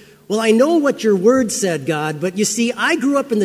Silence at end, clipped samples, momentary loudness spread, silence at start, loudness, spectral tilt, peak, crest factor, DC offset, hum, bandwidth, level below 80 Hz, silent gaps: 0 s; under 0.1%; 7 LU; 0.3 s; -16 LUFS; -4 dB/octave; -2 dBFS; 14 dB; under 0.1%; none; 16 kHz; -58 dBFS; none